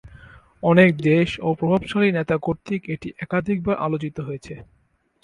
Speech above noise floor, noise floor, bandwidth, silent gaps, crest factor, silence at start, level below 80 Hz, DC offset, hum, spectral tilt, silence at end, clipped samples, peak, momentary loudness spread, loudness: 26 dB; -47 dBFS; 10.5 kHz; none; 20 dB; 0.05 s; -50 dBFS; under 0.1%; none; -8 dB/octave; 0.6 s; under 0.1%; -2 dBFS; 16 LU; -21 LUFS